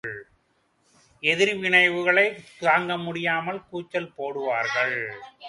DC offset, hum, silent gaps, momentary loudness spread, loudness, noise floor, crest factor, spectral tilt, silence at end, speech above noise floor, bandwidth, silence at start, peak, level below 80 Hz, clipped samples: under 0.1%; none; none; 14 LU; -23 LUFS; -68 dBFS; 22 dB; -4 dB/octave; 0 s; 44 dB; 11.5 kHz; 0.05 s; -4 dBFS; -68 dBFS; under 0.1%